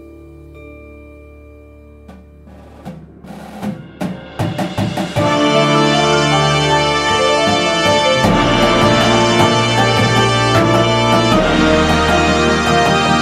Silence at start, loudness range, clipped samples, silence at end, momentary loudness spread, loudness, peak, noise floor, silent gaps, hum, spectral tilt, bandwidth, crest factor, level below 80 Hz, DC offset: 0 s; 15 LU; under 0.1%; 0 s; 14 LU; -12 LUFS; 0 dBFS; -39 dBFS; none; none; -4.5 dB/octave; 15.5 kHz; 14 dB; -34 dBFS; under 0.1%